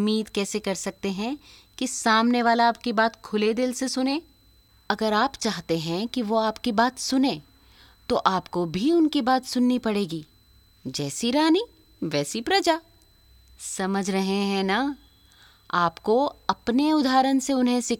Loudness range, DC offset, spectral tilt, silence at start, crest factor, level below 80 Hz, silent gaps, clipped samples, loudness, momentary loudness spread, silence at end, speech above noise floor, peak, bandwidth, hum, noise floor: 3 LU; under 0.1%; -4 dB/octave; 0 s; 22 dB; -58 dBFS; none; under 0.1%; -24 LUFS; 10 LU; 0.05 s; 34 dB; -4 dBFS; 17.5 kHz; none; -58 dBFS